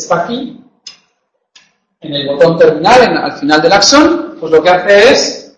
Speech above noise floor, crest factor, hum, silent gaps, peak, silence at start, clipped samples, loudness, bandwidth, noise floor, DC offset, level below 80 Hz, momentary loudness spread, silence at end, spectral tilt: 55 dB; 10 dB; none; none; 0 dBFS; 0 s; 0.8%; -8 LUFS; 11 kHz; -63 dBFS; under 0.1%; -44 dBFS; 13 LU; 0.15 s; -3.5 dB/octave